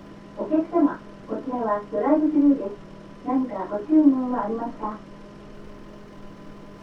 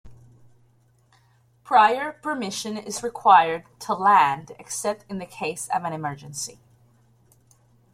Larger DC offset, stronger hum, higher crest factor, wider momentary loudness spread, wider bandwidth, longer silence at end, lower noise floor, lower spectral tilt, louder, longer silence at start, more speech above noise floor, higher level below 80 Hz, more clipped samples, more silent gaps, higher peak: neither; neither; about the same, 18 dB vs 22 dB; first, 25 LU vs 16 LU; second, 5.8 kHz vs 15.5 kHz; second, 0 s vs 1.4 s; second, -42 dBFS vs -60 dBFS; first, -8.5 dB/octave vs -3 dB/octave; about the same, -23 LUFS vs -23 LUFS; about the same, 0 s vs 0.05 s; second, 20 dB vs 38 dB; first, -52 dBFS vs -64 dBFS; neither; neither; second, -6 dBFS vs -2 dBFS